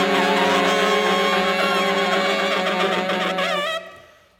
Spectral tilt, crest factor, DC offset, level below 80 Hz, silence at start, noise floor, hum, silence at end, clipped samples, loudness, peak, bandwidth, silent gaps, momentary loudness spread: -3.5 dB/octave; 14 dB; under 0.1%; -64 dBFS; 0 s; -47 dBFS; none; 0.4 s; under 0.1%; -19 LUFS; -6 dBFS; 18 kHz; none; 4 LU